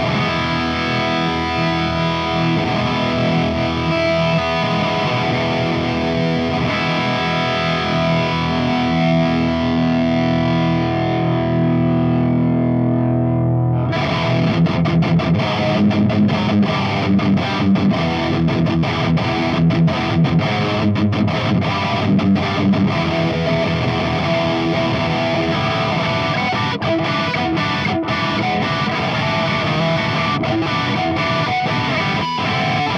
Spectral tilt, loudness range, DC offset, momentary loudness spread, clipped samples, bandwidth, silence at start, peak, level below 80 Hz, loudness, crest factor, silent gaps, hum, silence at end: -7 dB/octave; 2 LU; under 0.1%; 2 LU; under 0.1%; 7.6 kHz; 0 s; -6 dBFS; -44 dBFS; -17 LUFS; 12 dB; none; none; 0 s